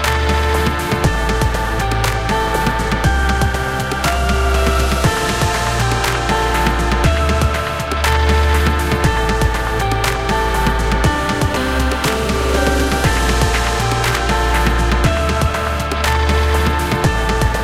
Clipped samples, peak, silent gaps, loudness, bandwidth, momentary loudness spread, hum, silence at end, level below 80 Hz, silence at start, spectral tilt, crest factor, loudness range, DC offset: under 0.1%; -2 dBFS; none; -16 LUFS; 16 kHz; 2 LU; none; 0 s; -20 dBFS; 0 s; -4.5 dB/octave; 14 dB; 1 LU; 0.2%